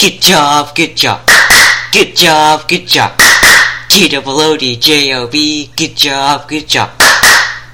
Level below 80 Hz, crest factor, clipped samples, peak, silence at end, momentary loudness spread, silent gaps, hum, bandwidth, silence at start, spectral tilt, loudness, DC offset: -36 dBFS; 8 dB; 2%; 0 dBFS; 0.05 s; 9 LU; none; none; over 20 kHz; 0 s; -1.5 dB/octave; -6 LUFS; 1%